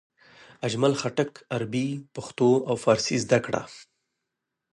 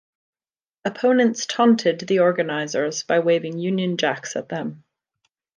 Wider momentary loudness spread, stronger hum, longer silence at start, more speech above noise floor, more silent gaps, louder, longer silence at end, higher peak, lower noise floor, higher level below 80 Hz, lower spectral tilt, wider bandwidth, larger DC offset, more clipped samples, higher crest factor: about the same, 11 LU vs 12 LU; neither; second, 0.6 s vs 0.85 s; second, 58 dB vs over 70 dB; neither; second, -26 LUFS vs -21 LUFS; about the same, 0.9 s vs 0.8 s; about the same, -6 dBFS vs -6 dBFS; second, -84 dBFS vs under -90 dBFS; first, -64 dBFS vs -74 dBFS; about the same, -5 dB/octave vs -4.5 dB/octave; first, 11.5 kHz vs 9.8 kHz; neither; neither; about the same, 20 dB vs 16 dB